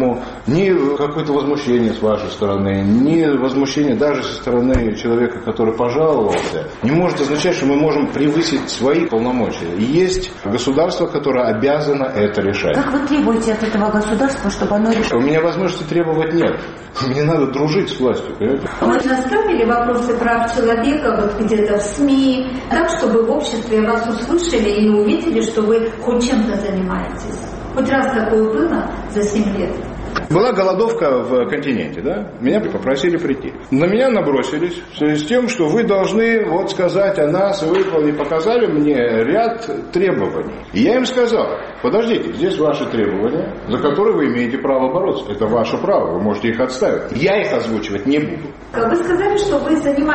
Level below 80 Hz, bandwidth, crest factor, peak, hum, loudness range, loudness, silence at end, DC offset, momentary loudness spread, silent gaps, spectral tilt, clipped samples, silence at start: -38 dBFS; 8.8 kHz; 14 dB; -2 dBFS; none; 2 LU; -17 LUFS; 0 s; under 0.1%; 6 LU; none; -6 dB/octave; under 0.1%; 0 s